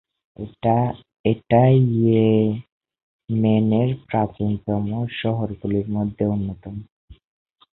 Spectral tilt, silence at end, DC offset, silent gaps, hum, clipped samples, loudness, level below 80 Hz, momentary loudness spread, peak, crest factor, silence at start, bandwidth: -13 dB/octave; 0.6 s; under 0.1%; 1.19-1.24 s, 2.72-2.80 s, 3.03-3.19 s, 6.92-7.08 s; none; under 0.1%; -21 LUFS; -48 dBFS; 13 LU; -4 dBFS; 18 dB; 0.4 s; 4.1 kHz